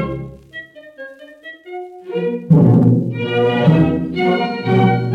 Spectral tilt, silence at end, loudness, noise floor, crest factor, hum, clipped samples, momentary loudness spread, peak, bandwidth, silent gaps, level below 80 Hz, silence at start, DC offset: -9.5 dB/octave; 0 s; -15 LUFS; -38 dBFS; 14 dB; none; under 0.1%; 23 LU; 0 dBFS; 5.2 kHz; none; -46 dBFS; 0 s; under 0.1%